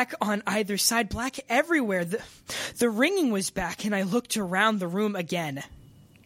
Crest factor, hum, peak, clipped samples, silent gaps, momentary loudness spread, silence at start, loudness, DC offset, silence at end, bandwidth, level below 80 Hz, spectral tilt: 20 dB; none; -8 dBFS; under 0.1%; none; 10 LU; 0 s; -26 LUFS; under 0.1%; 0.4 s; 16.5 kHz; -54 dBFS; -3.5 dB/octave